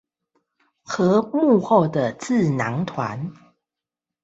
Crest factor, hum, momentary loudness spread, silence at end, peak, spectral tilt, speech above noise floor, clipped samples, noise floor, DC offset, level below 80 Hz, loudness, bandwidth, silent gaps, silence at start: 18 dB; none; 12 LU; 0.9 s; -4 dBFS; -7 dB/octave; 67 dB; under 0.1%; -87 dBFS; under 0.1%; -62 dBFS; -21 LUFS; 8.2 kHz; none; 0.9 s